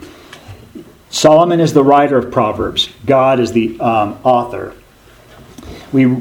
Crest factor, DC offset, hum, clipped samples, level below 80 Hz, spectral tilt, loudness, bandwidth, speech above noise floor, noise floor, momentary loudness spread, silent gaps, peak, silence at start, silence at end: 14 dB; under 0.1%; none; under 0.1%; -44 dBFS; -5.5 dB/octave; -13 LUFS; 17 kHz; 32 dB; -43 dBFS; 14 LU; none; 0 dBFS; 0 s; 0 s